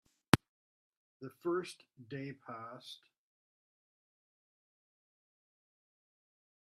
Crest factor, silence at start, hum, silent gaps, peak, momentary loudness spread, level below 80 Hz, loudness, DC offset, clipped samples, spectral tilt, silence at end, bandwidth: 42 dB; 0.35 s; none; 0.49-1.20 s; 0 dBFS; 21 LU; -66 dBFS; -37 LUFS; under 0.1%; under 0.1%; -5 dB/octave; 3.85 s; 14 kHz